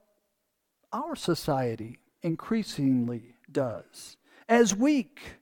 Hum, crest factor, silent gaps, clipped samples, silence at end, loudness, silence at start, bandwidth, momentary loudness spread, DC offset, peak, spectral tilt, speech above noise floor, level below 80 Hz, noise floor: none; 20 dB; none; under 0.1%; 0.1 s; -28 LUFS; 0.9 s; 19 kHz; 20 LU; under 0.1%; -8 dBFS; -5 dB/octave; 51 dB; -62 dBFS; -79 dBFS